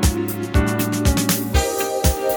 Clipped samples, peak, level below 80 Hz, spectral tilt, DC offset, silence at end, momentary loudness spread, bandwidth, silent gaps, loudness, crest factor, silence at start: under 0.1%; -4 dBFS; -24 dBFS; -4.5 dB/octave; under 0.1%; 0 s; 3 LU; over 20 kHz; none; -20 LUFS; 16 dB; 0 s